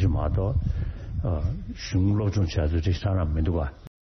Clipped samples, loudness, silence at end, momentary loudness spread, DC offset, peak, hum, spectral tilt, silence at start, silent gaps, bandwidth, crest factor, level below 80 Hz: under 0.1%; -27 LUFS; 0.15 s; 7 LU; under 0.1%; -12 dBFS; none; -7.5 dB/octave; 0 s; none; 6.4 kHz; 14 dB; -32 dBFS